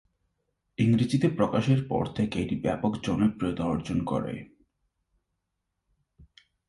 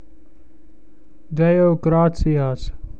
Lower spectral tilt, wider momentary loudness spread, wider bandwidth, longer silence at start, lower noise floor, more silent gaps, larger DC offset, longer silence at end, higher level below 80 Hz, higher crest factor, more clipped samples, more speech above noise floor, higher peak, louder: second, -7.5 dB/octave vs -9.5 dB/octave; second, 7 LU vs 12 LU; first, 11.5 kHz vs 7.8 kHz; second, 0.8 s vs 1.3 s; first, -82 dBFS vs -52 dBFS; neither; second, under 0.1% vs 2%; first, 0.45 s vs 0.05 s; second, -52 dBFS vs -32 dBFS; first, 20 dB vs 14 dB; neither; first, 55 dB vs 35 dB; second, -10 dBFS vs -6 dBFS; second, -27 LUFS vs -18 LUFS